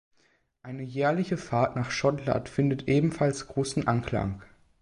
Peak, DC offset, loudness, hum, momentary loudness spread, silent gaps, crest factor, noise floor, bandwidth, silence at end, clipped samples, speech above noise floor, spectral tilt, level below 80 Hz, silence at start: -10 dBFS; under 0.1%; -28 LUFS; none; 10 LU; none; 18 dB; -68 dBFS; 11 kHz; 0.35 s; under 0.1%; 41 dB; -6.5 dB/octave; -52 dBFS; 0.65 s